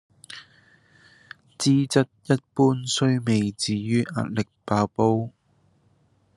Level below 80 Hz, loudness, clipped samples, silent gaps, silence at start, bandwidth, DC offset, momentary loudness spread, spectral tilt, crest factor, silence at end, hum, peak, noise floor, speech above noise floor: -64 dBFS; -23 LUFS; under 0.1%; none; 0.3 s; 12.5 kHz; under 0.1%; 14 LU; -5.5 dB/octave; 20 dB; 1.1 s; none; -4 dBFS; -64 dBFS; 41 dB